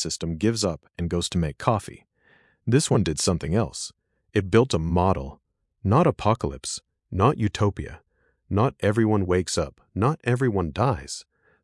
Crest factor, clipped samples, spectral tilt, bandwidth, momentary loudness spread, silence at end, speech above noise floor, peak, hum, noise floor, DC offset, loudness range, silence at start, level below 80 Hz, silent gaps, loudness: 20 dB; under 0.1%; -5.5 dB/octave; 12 kHz; 13 LU; 0.4 s; 37 dB; -4 dBFS; none; -61 dBFS; under 0.1%; 2 LU; 0 s; -46 dBFS; none; -24 LUFS